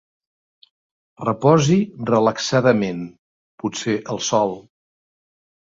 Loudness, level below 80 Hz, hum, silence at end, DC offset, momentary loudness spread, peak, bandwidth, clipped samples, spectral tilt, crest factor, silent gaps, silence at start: -19 LUFS; -58 dBFS; none; 1 s; under 0.1%; 13 LU; -2 dBFS; 7.8 kHz; under 0.1%; -5.5 dB/octave; 20 dB; 3.19-3.58 s; 1.2 s